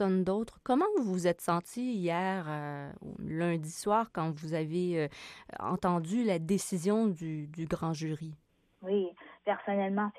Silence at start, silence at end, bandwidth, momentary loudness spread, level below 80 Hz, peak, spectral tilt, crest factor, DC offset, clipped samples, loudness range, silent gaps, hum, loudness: 0 s; 0 s; 14.5 kHz; 10 LU; -64 dBFS; -16 dBFS; -6.5 dB/octave; 16 dB; under 0.1%; under 0.1%; 2 LU; none; none; -33 LUFS